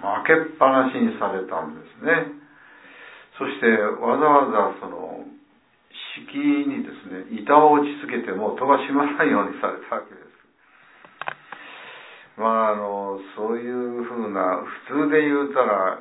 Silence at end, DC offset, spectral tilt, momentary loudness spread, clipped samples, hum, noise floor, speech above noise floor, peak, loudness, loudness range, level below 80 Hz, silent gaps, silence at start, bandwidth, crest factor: 0 s; under 0.1%; -9.5 dB/octave; 18 LU; under 0.1%; none; -59 dBFS; 37 dB; -2 dBFS; -21 LUFS; 7 LU; -74 dBFS; none; 0 s; 4 kHz; 22 dB